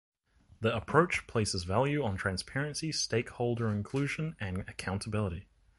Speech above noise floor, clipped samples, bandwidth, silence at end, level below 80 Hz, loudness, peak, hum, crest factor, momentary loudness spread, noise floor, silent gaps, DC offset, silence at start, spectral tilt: 28 dB; under 0.1%; 11.5 kHz; 0.35 s; -52 dBFS; -32 LUFS; -10 dBFS; none; 22 dB; 9 LU; -60 dBFS; none; under 0.1%; 0.6 s; -5 dB/octave